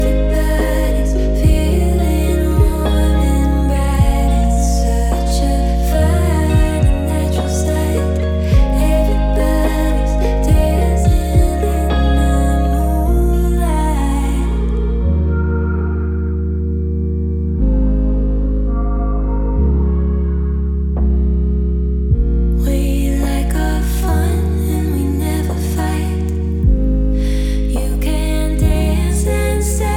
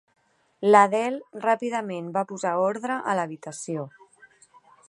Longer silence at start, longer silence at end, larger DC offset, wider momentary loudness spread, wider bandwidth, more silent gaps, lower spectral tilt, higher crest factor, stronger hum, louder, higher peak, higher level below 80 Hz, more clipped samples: second, 0 s vs 0.6 s; second, 0 s vs 1 s; neither; second, 4 LU vs 15 LU; first, 16 kHz vs 11.5 kHz; neither; first, -7 dB/octave vs -5 dB/octave; second, 12 dB vs 22 dB; neither; first, -16 LUFS vs -24 LUFS; about the same, -2 dBFS vs -2 dBFS; first, -16 dBFS vs -80 dBFS; neither